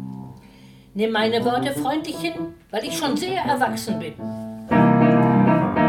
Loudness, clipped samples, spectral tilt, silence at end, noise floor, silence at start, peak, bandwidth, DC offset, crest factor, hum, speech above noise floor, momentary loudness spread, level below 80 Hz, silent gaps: -21 LUFS; under 0.1%; -6 dB/octave; 0 s; -47 dBFS; 0 s; -4 dBFS; 17 kHz; under 0.1%; 18 dB; none; 23 dB; 16 LU; -52 dBFS; none